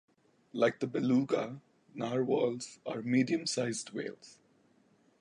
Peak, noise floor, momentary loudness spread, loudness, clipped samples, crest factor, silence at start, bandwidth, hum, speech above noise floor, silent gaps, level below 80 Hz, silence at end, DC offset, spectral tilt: -14 dBFS; -68 dBFS; 14 LU; -33 LUFS; under 0.1%; 20 dB; 0.55 s; 11 kHz; none; 36 dB; none; -80 dBFS; 0.85 s; under 0.1%; -5 dB/octave